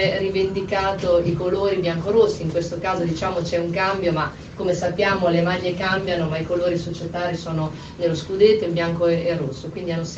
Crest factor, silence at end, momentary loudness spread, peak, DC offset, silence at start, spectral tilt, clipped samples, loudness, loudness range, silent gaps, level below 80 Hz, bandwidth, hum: 18 dB; 0 s; 8 LU; -4 dBFS; under 0.1%; 0 s; -6 dB/octave; under 0.1%; -22 LUFS; 1 LU; none; -44 dBFS; 8.2 kHz; none